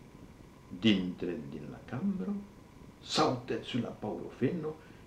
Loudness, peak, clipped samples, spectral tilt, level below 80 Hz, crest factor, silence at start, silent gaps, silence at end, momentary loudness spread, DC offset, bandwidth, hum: -34 LUFS; -14 dBFS; under 0.1%; -5.5 dB/octave; -62 dBFS; 20 dB; 0 s; none; 0 s; 24 LU; under 0.1%; 12.5 kHz; none